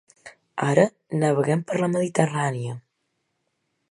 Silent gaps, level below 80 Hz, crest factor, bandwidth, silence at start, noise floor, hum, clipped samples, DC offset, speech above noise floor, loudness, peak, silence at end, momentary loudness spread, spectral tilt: none; -70 dBFS; 22 dB; 11.5 kHz; 0.25 s; -75 dBFS; none; under 0.1%; under 0.1%; 53 dB; -23 LUFS; -2 dBFS; 1.1 s; 13 LU; -6.5 dB/octave